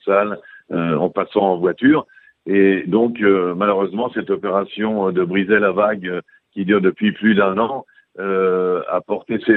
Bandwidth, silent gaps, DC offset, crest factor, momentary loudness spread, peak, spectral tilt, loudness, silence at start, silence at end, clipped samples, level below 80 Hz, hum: 4.2 kHz; none; under 0.1%; 16 dB; 10 LU; 0 dBFS; -10 dB/octave; -18 LUFS; 0.05 s; 0 s; under 0.1%; -60 dBFS; none